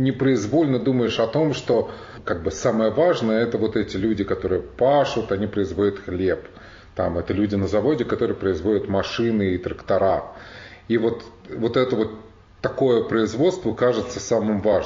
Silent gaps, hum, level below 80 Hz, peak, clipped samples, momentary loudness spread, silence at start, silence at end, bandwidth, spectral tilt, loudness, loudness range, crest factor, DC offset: none; none; -48 dBFS; -6 dBFS; under 0.1%; 9 LU; 0 s; 0 s; 7.4 kHz; -5.5 dB/octave; -22 LUFS; 2 LU; 14 dB; under 0.1%